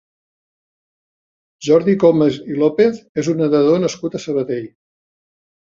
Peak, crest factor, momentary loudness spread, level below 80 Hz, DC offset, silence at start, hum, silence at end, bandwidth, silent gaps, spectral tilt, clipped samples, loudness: -2 dBFS; 16 dB; 11 LU; -60 dBFS; under 0.1%; 1.6 s; none; 1.1 s; 7.6 kHz; 3.09-3.15 s; -6.5 dB/octave; under 0.1%; -16 LUFS